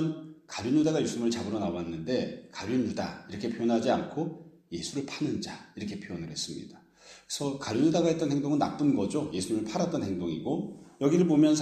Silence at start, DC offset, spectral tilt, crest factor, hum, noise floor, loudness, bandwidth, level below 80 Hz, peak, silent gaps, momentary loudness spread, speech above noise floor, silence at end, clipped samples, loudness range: 0 s; under 0.1%; -5.5 dB/octave; 18 dB; none; -55 dBFS; -30 LUFS; 12.5 kHz; -64 dBFS; -12 dBFS; none; 13 LU; 26 dB; 0 s; under 0.1%; 6 LU